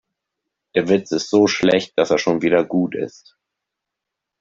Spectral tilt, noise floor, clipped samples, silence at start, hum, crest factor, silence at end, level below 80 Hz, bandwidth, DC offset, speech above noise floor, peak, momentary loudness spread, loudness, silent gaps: -5 dB/octave; -83 dBFS; under 0.1%; 0.75 s; none; 18 dB; 1.3 s; -58 dBFS; 7.8 kHz; under 0.1%; 65 dB; -2 dBFS; 8 LU; -18 LUFS; none